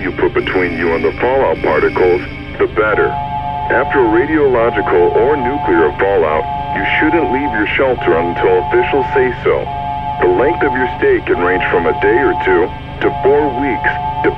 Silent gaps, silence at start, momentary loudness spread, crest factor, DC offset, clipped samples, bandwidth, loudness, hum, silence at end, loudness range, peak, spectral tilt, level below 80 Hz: none; 0 s; 5 LU; 12 dB; under 0.1%; under 0.1%; 5.8 kHz; -13 LUFS; none; 0 s; 1 LU; 0 dBFS; -8.5 dB/octave; -32 dBFS